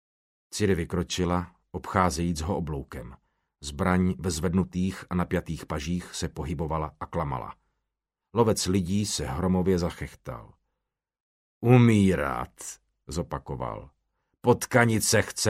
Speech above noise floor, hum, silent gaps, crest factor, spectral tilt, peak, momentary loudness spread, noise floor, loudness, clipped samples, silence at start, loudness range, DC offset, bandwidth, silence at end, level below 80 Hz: 59 dB; none; 11.20-11.61 s; 22 dB; -5.5 dB/octave; -4 dBFS; 18 LU; -85 dBFS; -27 LUFS; under 0.1%; 0.5 s; 5 LU; under 0.1%; 15.5 kHz; 0 s; -46 dBFS